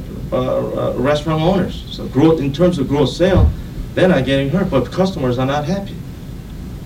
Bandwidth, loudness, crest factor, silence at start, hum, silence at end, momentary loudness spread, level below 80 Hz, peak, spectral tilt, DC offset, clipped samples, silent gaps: 16 kHz; -17 LUFS; 16 dB; 0 s; none; 0 s; 15 LU; -28 dBFS; 0 dBFS; -7 dB/octave; under 0.1%; under 0.1%; none